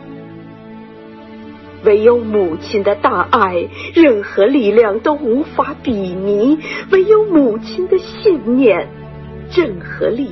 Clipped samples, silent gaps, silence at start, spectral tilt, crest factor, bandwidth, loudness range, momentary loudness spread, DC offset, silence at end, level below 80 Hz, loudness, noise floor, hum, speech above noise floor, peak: under 0.1%; none; 0 s; -7.5 dB/octave; 14 dB; 6.2 kHz; 2 LU; 23 LU; under 0.1%; 0 s; -46 dBFS; -14 LUFS; -35 dBFS; none; 22 dB; 0 dBFS